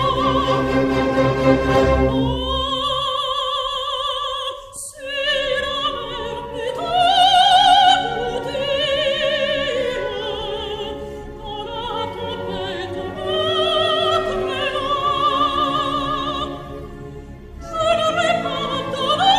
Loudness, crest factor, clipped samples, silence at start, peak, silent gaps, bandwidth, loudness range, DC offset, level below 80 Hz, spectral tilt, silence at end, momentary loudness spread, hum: -19 LUFS; 18 dB; under 0.1%; 0 s; -2 dBFS; none; 14 kHz; 8 LU; under 0.1%; -36 dBFS; -4.5 dB/octave; 0 s; 13 LU; none